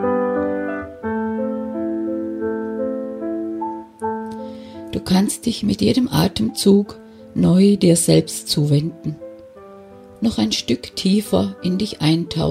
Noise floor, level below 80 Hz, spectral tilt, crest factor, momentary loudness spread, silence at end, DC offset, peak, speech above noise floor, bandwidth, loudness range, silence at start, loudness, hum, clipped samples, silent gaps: -41 dBFS; -48 dBFS; -5.5 dB/octave; 18 dB; 14 LU; 0 s; under 0.1%; -2 dBFS; 24 dB; 16 kHz; 8 LU; 0 s; -20 LUFS; none; under 0.1%; none